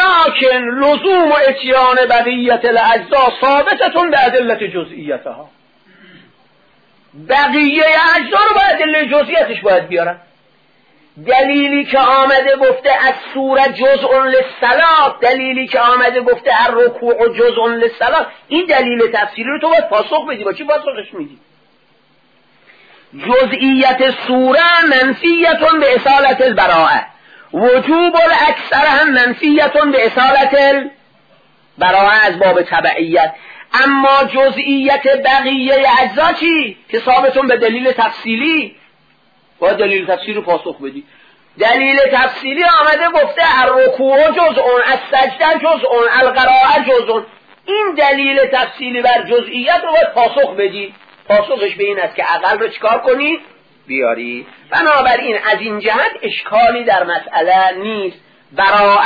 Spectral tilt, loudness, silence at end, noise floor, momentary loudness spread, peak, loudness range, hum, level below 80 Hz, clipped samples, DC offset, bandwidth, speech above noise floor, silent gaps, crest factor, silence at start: -5.5 dB/octave; -11 LUFS; 0 s; -54 dBFS; 8 LU; 0 dBFS; 5 LU; none; -50 dBFS; under 0.1%; under 0.1%; 5 kHz; 42 dB; none; 12 dB; 0 s